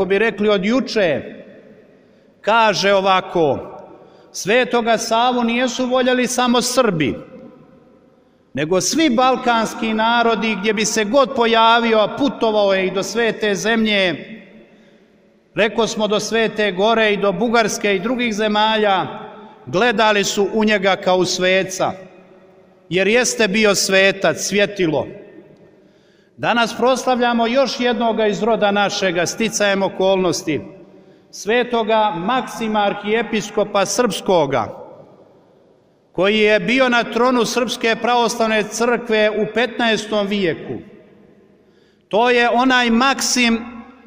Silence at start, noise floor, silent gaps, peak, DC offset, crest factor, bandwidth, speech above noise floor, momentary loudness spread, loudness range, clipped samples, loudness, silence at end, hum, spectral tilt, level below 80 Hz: 0 s; -54 dBFS; none; -2 dBFS; under 0.1%; 16 dB; 16 kHz; 37 dB; 8 LU; 4 LU; under 0.1%; -17 LUFS; 0.15 s; none; -3.5 dB/octave; -52 dBFS